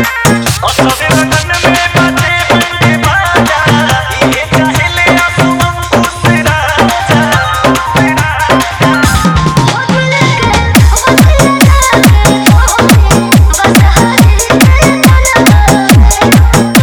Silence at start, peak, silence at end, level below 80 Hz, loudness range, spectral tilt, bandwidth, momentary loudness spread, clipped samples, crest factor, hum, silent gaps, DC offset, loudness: 0 s; 0 dBFS; 0 s; -14 dBFS; 3 LU; -4.5 dB/octave; over 20 kHz; 4 LU; 4%; 6 dB; none; none; under 0.1%; -7 LUFS